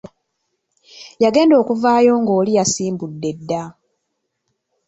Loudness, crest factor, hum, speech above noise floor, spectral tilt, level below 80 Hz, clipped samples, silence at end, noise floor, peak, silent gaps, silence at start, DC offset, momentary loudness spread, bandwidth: -16 LUFS; 16 dB; none; 58 dB; -5 dB/octave; -60 dBFS; under 0.1%; 1.15 s; -74 dBFS; -2 dBFS; none; 0.95 s; under 0.1%; 12 LU; 8.4 kHz